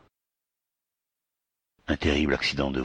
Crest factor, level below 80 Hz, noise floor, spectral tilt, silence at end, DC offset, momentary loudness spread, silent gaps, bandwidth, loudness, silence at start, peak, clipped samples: 20 dB; -44 dBFS; -88 dBFS; -5.5 dB/octave; 0 s; under 0.1%; 9 LU; none; 9.8 kHz; -26 LUFS; 1.9 s; -10 dBFS; under 0.1%